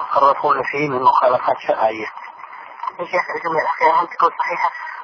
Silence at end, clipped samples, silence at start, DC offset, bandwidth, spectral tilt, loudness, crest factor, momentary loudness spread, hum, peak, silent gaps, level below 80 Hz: 0 s; under 0.1%; 0 s; under 0.1%; 5.4 kHz; -5.5 dB/octave; -18 LUFS; 16 dB; 15 LU; none; -2 dBFS; none; -66 dBFS